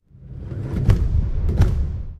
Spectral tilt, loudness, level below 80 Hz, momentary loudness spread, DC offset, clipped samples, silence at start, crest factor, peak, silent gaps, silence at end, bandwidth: -8.5 dB/octave; -22 LUFS; -22 dBFS; 14 LU; under 0.1%; under 0.1%; 0.2 s; 18 dB; -2 dBFS; none; 0 s; 8.8 kHz